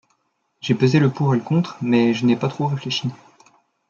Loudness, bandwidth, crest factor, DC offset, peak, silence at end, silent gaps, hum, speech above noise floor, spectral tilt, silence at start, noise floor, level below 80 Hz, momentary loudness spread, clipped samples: -20 LUFS; 7.2 kHz; 18 dB; under 0.1%; -4 dBFS; 0.75 s; none; none; 50 dB; -7 dB/octave; 0.65 s; -69 dBFS; -64 dBFS; 8 LU; under 0.1%